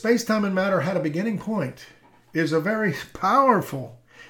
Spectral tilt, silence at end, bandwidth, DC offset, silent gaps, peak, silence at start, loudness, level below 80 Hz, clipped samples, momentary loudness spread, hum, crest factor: -6 dB/octave; 0.05 s; 19 kHz; under 0.1%; none; -4 dBFS; 0 s; -23 LUFS; -60 dBFS; under 0.1%; 13 LU; none; 18 dB